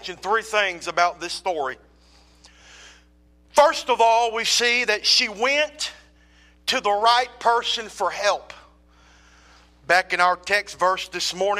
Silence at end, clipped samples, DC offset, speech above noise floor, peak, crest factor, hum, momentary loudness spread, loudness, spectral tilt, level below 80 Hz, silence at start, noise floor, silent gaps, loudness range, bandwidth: 0 s; under 0.1%; under 0.1%; 34 dB; -4 dBFS; 18 dB; none; 9 LU; -21 LUFS; -0.5 dB/octave; -56 dBFS; 0 s; -56 dBFS; none; 5 LU; 15.5 kHz